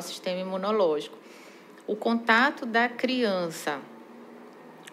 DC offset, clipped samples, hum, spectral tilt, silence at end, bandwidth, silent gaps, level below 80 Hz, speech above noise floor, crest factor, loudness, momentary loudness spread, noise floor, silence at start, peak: under 0.1%; under 0.1%; none; -4 dB/octave; 0 s; 15.5 kHz; none; under -90 dBFS; 21 dB; 20 dB; -26 LUFS; 25 LU; -48 dBFS; 0 s; -8 dBFS